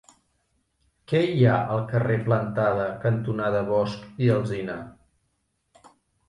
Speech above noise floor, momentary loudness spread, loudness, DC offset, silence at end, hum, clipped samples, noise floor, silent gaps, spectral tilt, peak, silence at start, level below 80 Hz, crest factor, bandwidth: 50 dB; 10 LU; -24 LUFS; under 0.1%; 1.4 s; none; under 0.1%; -73 dBFS; none; -8.5 dB/octave; -8 dBFS; 1.1 s; -56 dBFS; 18 dB; 10.5 kHz